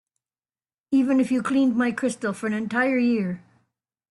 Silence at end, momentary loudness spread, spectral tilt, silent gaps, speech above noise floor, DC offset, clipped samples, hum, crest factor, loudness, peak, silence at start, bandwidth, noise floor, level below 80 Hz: 0.7 s; 7 LU; -6 dB/octave; none; over 68 dB; under 0.1%; under 0.1%; none; 14 dB; -23 LUFS; -10 dBFS; 0.9 s; 11.5 kHz; under -90 dBFS; -68 dBFS